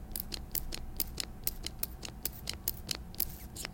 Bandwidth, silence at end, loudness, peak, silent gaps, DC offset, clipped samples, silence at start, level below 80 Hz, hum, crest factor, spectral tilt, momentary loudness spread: 17 kHz; 0 s; -37 LUFS; -8 dBFS; none; under 0.1%; under 0.1%; 0 s; -46 dBFS; none; 30 dB; -2 dB/octave; 4 LU